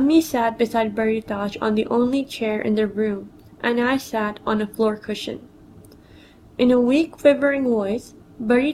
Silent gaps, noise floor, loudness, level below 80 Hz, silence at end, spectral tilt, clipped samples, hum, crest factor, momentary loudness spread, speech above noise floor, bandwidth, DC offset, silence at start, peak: none; -48 dBFS; -21 LUFS; -54 dBFS; 0 s; -5.5 dB/octave; under 0.1%; none; 18 dB; 11 LU; 27 dB; 16 kHz; under 0.1%; 0 s; -2 dBFS